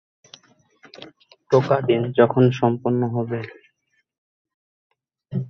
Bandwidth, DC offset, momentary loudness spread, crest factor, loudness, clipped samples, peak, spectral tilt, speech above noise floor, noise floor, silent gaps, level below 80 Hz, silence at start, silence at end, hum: 6.6 kHz; under 0.1%; 18 LU; 20 dB; -20 LUFS; under 0.1%; -2 dBFS; -8.5 dB/octave; 50 dB; -70 dBFS; 4.18-4.45 s, 4.54-4.90 s; -62 dBFS; 0.95 s; 0 s; none